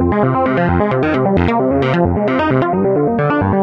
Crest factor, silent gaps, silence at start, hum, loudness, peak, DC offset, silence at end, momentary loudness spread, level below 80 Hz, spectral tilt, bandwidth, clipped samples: 12 dB; none; 0 s; none; -14 LUFS; -2 dBFS; under 0.1%; 0 s; 1 LU; -38 dBFS; -9.5 dB/octave; 6.6 kHz; under 0.1%